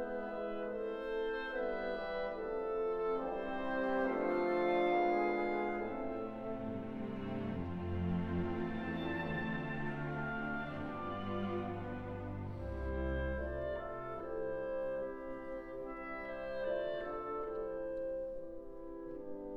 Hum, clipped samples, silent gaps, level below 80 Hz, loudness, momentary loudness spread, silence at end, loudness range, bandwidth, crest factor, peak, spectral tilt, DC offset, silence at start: none; under 0.1%; none; -52 dBFS; -39 LUFS; 9 LU; 0 s; 6 LU; 6.4 kHz; 16 dB; -22 dBFS; -8.5 dB/octave; under 0.1%; 0 s